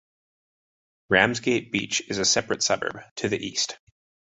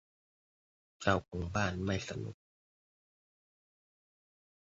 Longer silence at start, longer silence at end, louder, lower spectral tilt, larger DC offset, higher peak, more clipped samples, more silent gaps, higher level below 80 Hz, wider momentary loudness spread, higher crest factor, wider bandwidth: about the same, 1.1 s vs 1 s; second, 0.55 s vs 2.35 s; first, -24 LUFS vs -36 LUFS; second, -2.5 dB/octave vs -4.5 dB/octave; neither; first, -2 dBFS vs -12 dBFS; neither; first, 3.11-3.16 s vs none; about the same, -58 dBFS vs -54 dBFS; about the same, 9 LU vs 10 LU; about the same, 24 dB vs 28 dB; first, 8.4 kHz vs 7.6 kHz